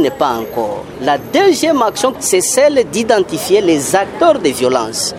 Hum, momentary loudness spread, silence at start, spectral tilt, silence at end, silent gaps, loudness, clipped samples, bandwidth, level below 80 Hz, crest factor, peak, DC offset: none; 6 LU; 0 s; -3 dB/octave; 0 s; none; -13 LUFS; under 0.1%; 16.5 kHz; -48 dBFS; 14 dB; 0 dBFS; under 0.1%